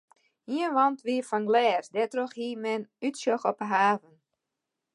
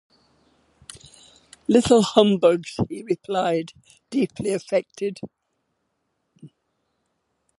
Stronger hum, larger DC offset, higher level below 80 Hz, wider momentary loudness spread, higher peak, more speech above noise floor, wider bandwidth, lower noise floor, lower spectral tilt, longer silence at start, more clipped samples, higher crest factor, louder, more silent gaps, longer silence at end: neither; neither; second, -86 dBFS vs -56 dBFS; second, 9 LU vs 23 LU; second, -10 dBFS vs 0 dBFS; first, 58 dB vs 53 dB; about the same, 11.5 kHz vs 11.5 kHz; first, -86 dBFS vs -74 dBFS; about the same, -4.5 dB/octave vs -5.5 dB/octave; second, 0.5 s vs 0.95 s; neither; second, 18 dB vs 24 dB; second, -28 LUFS vs -22 LUFS; neither; second, 0.95 s vs 1.1 s